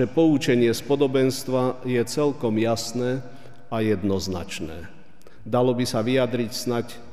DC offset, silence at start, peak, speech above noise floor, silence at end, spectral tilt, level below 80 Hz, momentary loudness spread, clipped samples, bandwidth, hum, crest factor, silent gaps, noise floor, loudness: 1%; 0 s; -8 dBFS; 28 dB; 0 s; -5.5 dB/octave; -54 dBFS; 11 LU; under 0.1%; 15.5 kHz; none; 16 dB; none; -51 dBFS; -24 LUFS